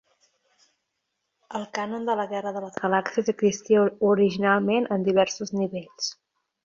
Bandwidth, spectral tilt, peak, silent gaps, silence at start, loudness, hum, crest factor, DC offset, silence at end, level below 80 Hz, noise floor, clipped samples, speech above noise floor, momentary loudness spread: 7.4 kHz; -5 dB/octave; -8 dBFS; none; 1.5 s; -25 LUFS; none; 18 dB; under 0.1%; 0.5 s; -68 dBFS; -79 dBFS; under 0.1%; 55 dB; 10 LU